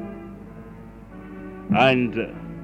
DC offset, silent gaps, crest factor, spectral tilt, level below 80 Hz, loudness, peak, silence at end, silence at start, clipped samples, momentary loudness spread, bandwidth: under 0.1%; none; 20 dB; -7 dB/octave; -48 dBFS; -21 LUFS; -6 dBFS; 0 s; 0 s; under 0.1%; 24 LU; 9 kHz